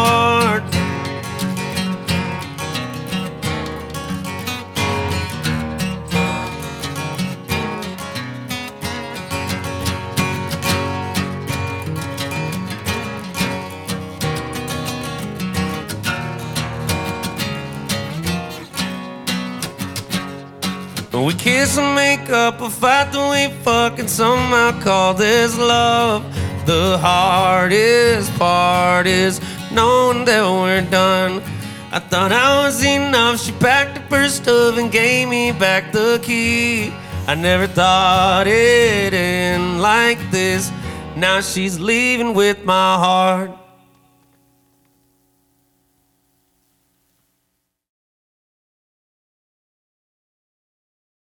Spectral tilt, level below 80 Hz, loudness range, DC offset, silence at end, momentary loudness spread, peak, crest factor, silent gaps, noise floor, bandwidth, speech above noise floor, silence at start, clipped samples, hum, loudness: -4 dB/octave; -46 dBFS; 9 LU; under 0.1%; 7.65 s; 12 LU; 0 dBFS; 18 dB; none; -72 dBFS; 18 kHz; 57 dB; 0 s; under 0.1%; none; -17 LUFS